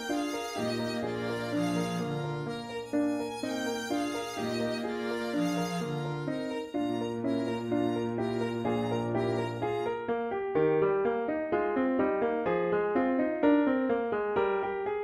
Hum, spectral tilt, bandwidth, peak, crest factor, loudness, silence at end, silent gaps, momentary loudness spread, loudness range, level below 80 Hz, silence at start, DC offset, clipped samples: none; -6 dB/octave; 15 kHz; -14 dBFS; 16 dB; -31 LUFS; 0 s; none; 6 LU; 4 LU; -64 dBFS; 0 s; under 0.1%; under 0.1%